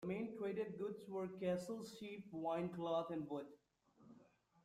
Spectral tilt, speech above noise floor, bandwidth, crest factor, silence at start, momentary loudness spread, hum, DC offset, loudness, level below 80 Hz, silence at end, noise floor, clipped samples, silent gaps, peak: -7 dB/octave; 26 dB; 15 kHz; 16 dB; 0 s; 8 LU; none; under 0.1%; -45 LUFS; -82 dBFS; 0.4 s; -71 dBFS; under 0.1%; none; -30 dBFS